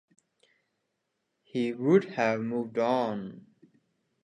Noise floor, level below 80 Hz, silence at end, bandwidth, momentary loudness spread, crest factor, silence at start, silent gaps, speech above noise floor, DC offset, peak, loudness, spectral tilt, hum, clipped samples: -81 dBFS; -78 dBFS; 0.85 s; 9.8 kHz; 13 LU; 20 dB; 1.55 s; none; 53 dB; under 0.1%; -10 dBFS; -28 LUFS; -7 dB/octave; none; under 0.1%